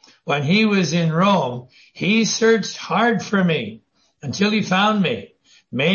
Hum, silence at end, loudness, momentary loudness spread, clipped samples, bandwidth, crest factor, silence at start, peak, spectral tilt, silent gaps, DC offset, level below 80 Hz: none; 0 s; -18 LUFS; 13 LU; under 0.1%; 7.2 kHz; 14 dB; 0.25 s; -4 dBFS; -5 dB/octave; none; under 0.1%; -62 dBFS